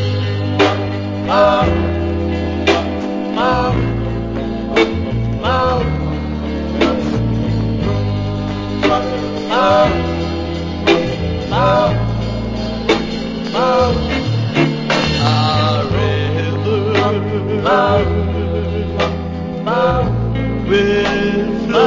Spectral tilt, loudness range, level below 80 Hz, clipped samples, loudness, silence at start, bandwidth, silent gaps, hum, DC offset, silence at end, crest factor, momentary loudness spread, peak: -6.5 dB/octave; 2 LU; -28 dBFS; under 0.1%; -16 LUFS; 0 s; 7.6 kHz; none; none; under 0.1%; 0 s; 16 dB; 8 LU; 0 dBFS